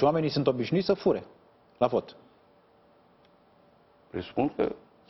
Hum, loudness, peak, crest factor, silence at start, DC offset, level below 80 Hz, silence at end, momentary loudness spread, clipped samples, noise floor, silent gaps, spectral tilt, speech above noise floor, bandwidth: none; -29 LUFS; -8 dBFS; 22 dB; 0 s; under 0.1%; -62 dBFS; 0.3 s; 11 LU; under 0.1%; -61 dBFS; none; -8 dB/octave; 34 dB; 6 kHz